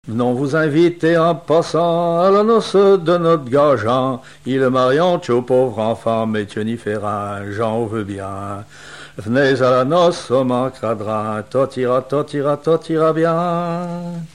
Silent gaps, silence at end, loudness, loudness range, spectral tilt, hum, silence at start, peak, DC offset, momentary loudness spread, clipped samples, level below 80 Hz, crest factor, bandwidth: none; 0.1 s; -17 LUFS; 6 LU; -7 dB/octave; none; 0.05 s; -4 dBFS; 0.4%; 11 LU; under 0.1%; -56 dBFS; 14 dB; 11.5 kHz